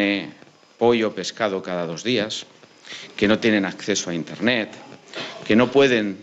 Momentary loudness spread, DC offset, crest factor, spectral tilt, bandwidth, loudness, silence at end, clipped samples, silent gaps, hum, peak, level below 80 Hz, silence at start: 17 LU; under 0.1%; 16 dB; -4.5 dB/octave; 8.2 kHz; -21 LUFS; 0 s; under 0.1%; none; none; -6 dBFS; -60 dBFS; 0 s